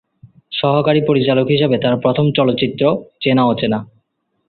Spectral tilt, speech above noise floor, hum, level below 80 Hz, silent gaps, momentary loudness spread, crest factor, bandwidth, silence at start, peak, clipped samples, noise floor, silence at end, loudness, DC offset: -11.5 dB/octave; 52 dB; none; -54 dBFS; none; 5 LU; 14 dB; 4.5 kHz; 0.5 s; -2 dBFS; under 0.1%; -67 dBFS; 0.65 s; -15 LUFS; under 0.1%